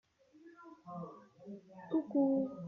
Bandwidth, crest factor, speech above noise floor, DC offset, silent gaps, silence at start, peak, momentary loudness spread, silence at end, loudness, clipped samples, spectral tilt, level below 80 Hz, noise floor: 3.9 kHz; 18 dB; 26 dB; under 0.1%; none; 0.45 s; -22 dBFS; 23 LU; 0 s; -36 LUFS; under 0.1%; -10 dB/octave; -82 dBFS; -62 dBFS